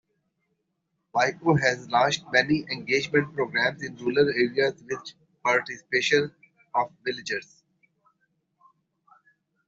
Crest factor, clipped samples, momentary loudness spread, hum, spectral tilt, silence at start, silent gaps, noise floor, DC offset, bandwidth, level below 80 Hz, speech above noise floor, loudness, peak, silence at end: 22 dB; under 0.1%; 10 LU; none; -4.5 dB/octave; 1.15 s; none; -78 dBFS; under 0.1%; 7.8 kHz; -66 dBFS; 53 dB; -25 LUFS; -6 dBFS; 2.25 s